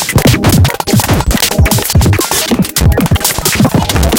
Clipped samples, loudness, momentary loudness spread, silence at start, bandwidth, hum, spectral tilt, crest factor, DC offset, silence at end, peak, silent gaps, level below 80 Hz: under 0.1%; -10 LUFS; 2 LU; 0 s; 17.5 kHz; none; -4.5 dB/octave; 10 dB; under 0.1%; 0 s; 0 dBFS; none; -18 dBFS